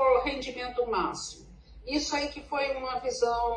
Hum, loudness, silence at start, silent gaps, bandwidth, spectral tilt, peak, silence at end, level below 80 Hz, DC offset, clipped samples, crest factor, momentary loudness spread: none; -30 LUFS; 0 s; none; 10.5 kHz; -3 dB/octave; -12 dBFS; 0 s; -50 dBFS; under 0.1%; under 0.1%; 18 dB; 11 LU